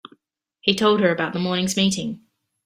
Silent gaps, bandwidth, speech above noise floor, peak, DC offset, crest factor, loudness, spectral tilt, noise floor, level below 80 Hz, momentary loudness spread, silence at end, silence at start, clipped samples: none; 15.5 kHz; 44 dB; -2 dBFS; under 0.1%; 20 dB; -21 LUFS; -4 dB/octave; -64 dBFS; -60 dBFS; 11 LU; 0.5 s; 0.65 s; under 0.1%